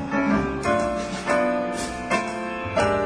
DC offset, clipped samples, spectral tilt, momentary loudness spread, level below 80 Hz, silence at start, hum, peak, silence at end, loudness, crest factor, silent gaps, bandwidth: under 0.1%; under 0.1%; -5 dB/octave; 6 LU; -44 dBFS; 0 s; none; -8 dBFS; 0 s; -24 LUFS; 16 dB; none; 11 kHz